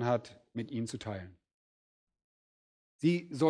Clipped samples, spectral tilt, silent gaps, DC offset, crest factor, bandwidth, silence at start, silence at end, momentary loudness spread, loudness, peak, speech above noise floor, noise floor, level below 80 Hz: under 0.1%; -7 dB/octave; 1.54-2.07 s, 2.24-2.99 s; under 0.1%; 20 dB; 10.5 kHz; 0 s; 0 s; 13 LU; -36 LUFS; -16 dBFS; over 57 dB; under -90 dBFS; -74 dBFS